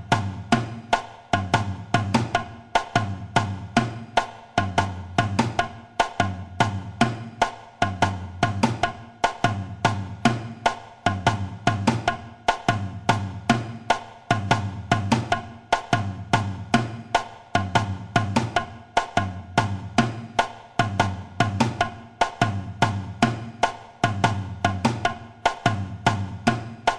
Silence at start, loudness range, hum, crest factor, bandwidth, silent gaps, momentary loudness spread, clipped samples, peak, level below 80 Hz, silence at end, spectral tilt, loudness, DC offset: 0 s; 1 LU; none; 22 dB; 12 kHz; none; 4 LU; under 0.1%; -2 dBFS; -46 dBFS; 0 s; -5.5 dB/octave; -25 LUFS; under 0.1%